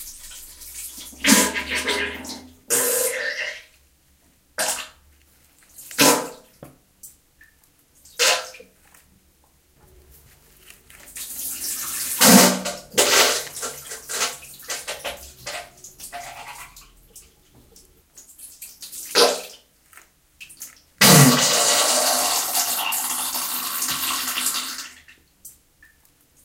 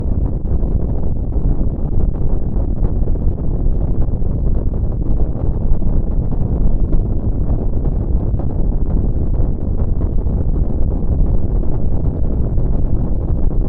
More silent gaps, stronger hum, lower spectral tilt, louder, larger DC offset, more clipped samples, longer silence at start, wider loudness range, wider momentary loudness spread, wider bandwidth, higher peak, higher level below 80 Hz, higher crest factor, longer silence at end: neither; neither; second, -2.5 dB/octave vs -13.5 dB/octave; about the same, -19 LUFS vs -20 LUFS; neither; neither; about the same, 0 s vs 0 s; first, 16 LU vs 1 LU; first, 23 LU vs 2 LU; first, 17 kHz vs 1.6 kHz; about the same, 0 dBFS vs -2 dBFS; second, -56 dBFS vs -16 dBFS; first, 24 dB vs 12 dB; first, 0.95 s vs 0 s